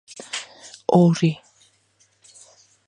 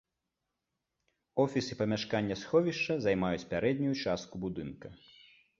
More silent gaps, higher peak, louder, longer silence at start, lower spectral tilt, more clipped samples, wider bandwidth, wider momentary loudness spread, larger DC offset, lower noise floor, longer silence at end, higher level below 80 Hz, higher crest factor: neither; first, -4 dBFS vs -14 dBFS; first, -21 LUFS vs -32 LUFS; second, 0.35 s vs 1.35 s; about the same, -6.5 dB/octave vs -6 dB/octave; neither; first, 10 kHz vs 7.6 kHz; first, 19 LU vs 10 LU; neither; second, -62 dBFS vs -86 dBFS; first, 1.55 s vs 0.65 s; about the same, -66 dBFS vs -62 dBFS; about the same, 20 dB vs 20 dB